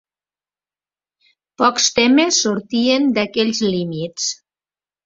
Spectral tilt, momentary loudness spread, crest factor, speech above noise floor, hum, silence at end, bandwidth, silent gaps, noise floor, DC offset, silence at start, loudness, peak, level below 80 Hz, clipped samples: -3 dB/octave; 10 LU; 18 dB; over 73 dB; none; 0.7 s; 7.8 kHz; none; under -90 dBFS; under 0.1%; 1.6 s; -17 LUFS; -2 dBFS; -60 dBFS; under 0.1%